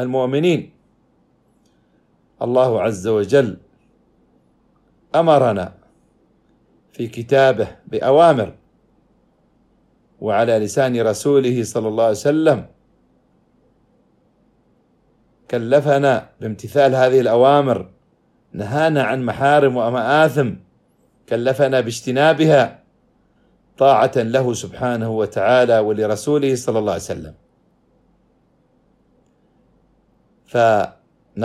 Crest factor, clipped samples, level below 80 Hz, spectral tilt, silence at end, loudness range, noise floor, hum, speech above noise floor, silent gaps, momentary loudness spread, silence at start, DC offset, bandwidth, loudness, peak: 18 dB; under 0.1%; -58 dBFS; -6 dB/octave; 0 s; 7 LU; -60 dBFS; none; 43 dB; none; 12 LU; 0 s; under 0.1%; 14.5 kHz; -17 LUFS; -2 dBFS